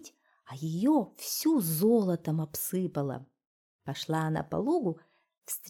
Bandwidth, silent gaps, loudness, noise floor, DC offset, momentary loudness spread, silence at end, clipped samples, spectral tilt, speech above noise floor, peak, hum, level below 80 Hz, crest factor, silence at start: 19 kHz; 3.46-3.79 s, 5.38-5.42 s; -30 LUFS; -55 dBFS; under 0.1%; 14 LU; 0 s; under 0.1%; -5.5 dB/octave; 25 dB; -16 dBFS; none; -68 dBFS; 16 dB; 0 s